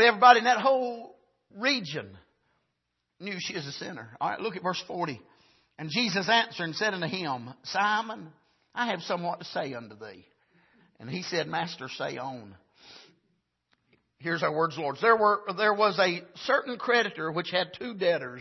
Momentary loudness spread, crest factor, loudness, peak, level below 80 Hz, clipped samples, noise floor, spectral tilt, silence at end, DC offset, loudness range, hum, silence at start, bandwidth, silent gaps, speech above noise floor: 16 LU; 26 dB; -27 LUFS; -4 dBFS; -76 dBFS; under 0.1%; -81 dBFS; -4 dB/octave; 0 s; under 0.1%; 10 LU; none; 0 s; 6.2 kHz; none; 53 dB